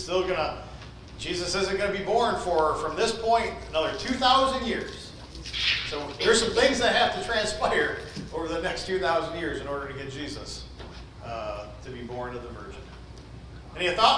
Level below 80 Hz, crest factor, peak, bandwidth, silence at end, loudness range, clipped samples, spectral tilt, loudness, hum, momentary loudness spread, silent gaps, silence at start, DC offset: -46 dBFS; 18 dB; -8 dBFS; 10.5 kHz; 0 s; 12 LU; under 0.1%; -3 dB/octave; -26 LUFS; none; 20 LU; none; 0 s; under 0.1%